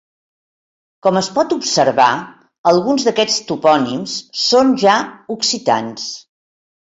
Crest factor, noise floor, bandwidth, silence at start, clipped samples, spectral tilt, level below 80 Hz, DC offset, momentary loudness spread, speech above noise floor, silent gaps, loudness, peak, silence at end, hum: 16 dB; under -90 dBFS; 8 kHz; 1.05 s; under 0.1%; -3.5 dB/octave; -60 dBFS; under 0.1%; 12 LU; over 75 dB; 2.58-2.64 s; -15 LUFS; -2 dBFS; 0.65 s; none